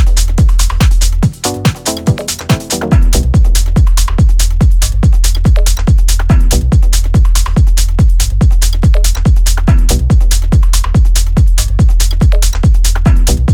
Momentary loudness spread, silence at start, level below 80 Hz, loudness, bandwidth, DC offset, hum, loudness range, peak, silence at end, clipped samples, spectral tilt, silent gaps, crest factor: 3 LU; 0 s; -8 dBFS; -11 LUFS; 16.5 kHz; under 0.1%; none; 1 LU; 0 dBFS; 0 s; under 0.1%; -5 dB/octave; none; 8 dB